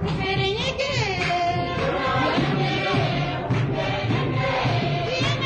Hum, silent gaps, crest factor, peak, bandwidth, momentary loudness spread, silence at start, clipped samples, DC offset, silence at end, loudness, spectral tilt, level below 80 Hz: none; none; 12 dB; -12 dBFS; 9 kHz; 2 LU; 0 s; under 0.1%; under 0.1%; 0 s; -23 LUFS; -6 dB/octave; -42 dBFS